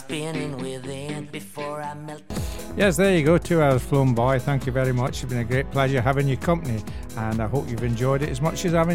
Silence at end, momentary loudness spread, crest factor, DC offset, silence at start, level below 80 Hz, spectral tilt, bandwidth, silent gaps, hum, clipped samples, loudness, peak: 0 s; 13 LU; 18 dB; 1%; 0 s; -40 dBFS; -6.5 dB/octave; 16.5 kHz; none; none; under 0.1%; -23 LUFS; -4 dBFS